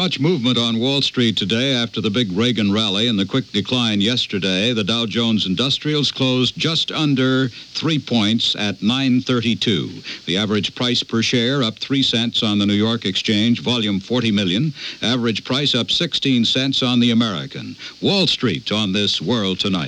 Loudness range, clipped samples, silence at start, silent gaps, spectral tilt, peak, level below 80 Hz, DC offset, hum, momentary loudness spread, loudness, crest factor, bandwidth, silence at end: 1 LU; under 0.1%; 0 s; none; -5 dB/octave; -4 dBFS; -58 dBFS; under 0.1%; none; 4 LU; -18 LUFS; 14 dB; 10.5 kHz; 0 s